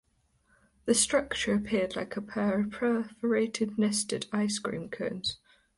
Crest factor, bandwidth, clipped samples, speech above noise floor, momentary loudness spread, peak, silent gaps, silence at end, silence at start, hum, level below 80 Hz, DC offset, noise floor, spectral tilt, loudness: 18 dB; 11.5 kHz; under 0.1%; 40 dB; 10 LU; -12 dBFS; none; 0.4 s; 0.85 s; none; -60 dBFS; under 0.1%; -70 dBFS; -3.5 dB/octave; -30 LUFS